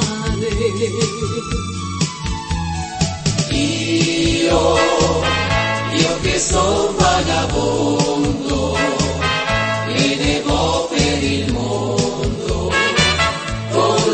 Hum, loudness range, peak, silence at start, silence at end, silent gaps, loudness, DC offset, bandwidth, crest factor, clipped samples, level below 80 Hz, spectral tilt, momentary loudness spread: none; 4 LU; 0 dBFS; 0 s; 0 s; none; -17 LUFS; under 0.1%; 8.8 kHz; 18 dB; under 0.1%; -30 dBFS; -4 dB/octave; 7 LU